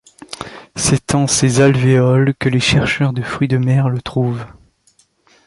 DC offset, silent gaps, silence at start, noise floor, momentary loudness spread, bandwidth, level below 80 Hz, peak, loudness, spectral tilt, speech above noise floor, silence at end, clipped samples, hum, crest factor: under 0.1%; none; 0.3 s; -56 dBFS; 17 LU; 11.5 kHz; -40 dBFS; -2 dBFS; -15 LUFS; -5 dB/octave; 42 dB; 0.95 s; under 0.1%; none; 14 dB